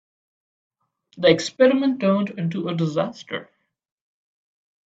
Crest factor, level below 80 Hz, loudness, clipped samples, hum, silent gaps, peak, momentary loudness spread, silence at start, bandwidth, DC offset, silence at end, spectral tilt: 22 dB; -68 dBFS; -21 LUFS; under 0.1%; none; none; -2 dBFS; 13 LU; 1.15 s; 8 kHz; under 0.1%; 1.4 s; -6 dB/octave